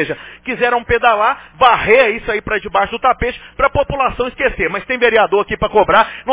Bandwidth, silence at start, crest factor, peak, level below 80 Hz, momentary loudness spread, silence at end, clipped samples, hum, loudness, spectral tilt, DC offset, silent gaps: 4 kHz; 0 s; 14 dB; 0 dBFS; -36 dBFS; 8 LU; 0 s; under 0.1%; none; -14 LUFS; -8 dB/octave; under 0.1%; none